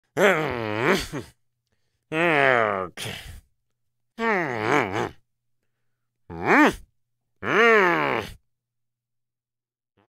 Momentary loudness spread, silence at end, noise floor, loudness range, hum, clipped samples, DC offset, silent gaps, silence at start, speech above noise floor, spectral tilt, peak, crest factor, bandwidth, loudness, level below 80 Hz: 16 LU; 1.75 s; -89 dBFS; 6 LU; none; under 0.1%; under 0.1%; none; 0.15 s; 65 dB; -5 dB/octave; -4 dBFS; 22 dB; 16 kHz; -21 LUFS; -54 dBFS